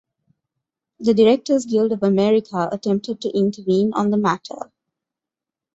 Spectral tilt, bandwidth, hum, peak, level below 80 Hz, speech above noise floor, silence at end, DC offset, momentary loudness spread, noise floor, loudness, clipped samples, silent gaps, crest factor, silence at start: -6.5 dB/octave; 8 kHz; none; -4 dBFS; -62 dBFS; 69 dB; 1.1 s; under 0.1%; 9 LU; -87 dBFS; -19 LUFS; under 0.1%; none; 16 dB; 1 s